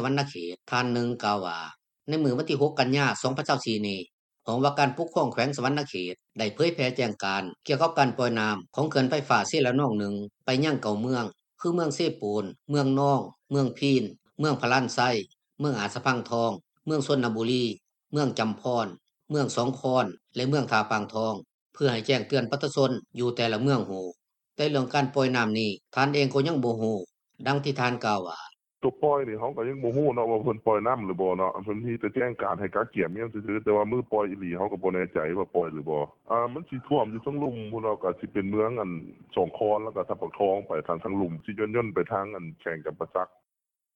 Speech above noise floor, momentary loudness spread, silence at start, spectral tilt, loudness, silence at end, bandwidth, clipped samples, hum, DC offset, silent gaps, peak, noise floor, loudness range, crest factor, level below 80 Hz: 61 dB; 9 LU; 0 s; -6 dB/octave; -28 LUFS; 0.7 s; 9 kHz; under 0.1%; none; under 0.1%; 4.13-4.29 s, 21.54-21.70 s; -8 dBFS; -88 dBFS; 3 LU; 20 dB; -66 dBFS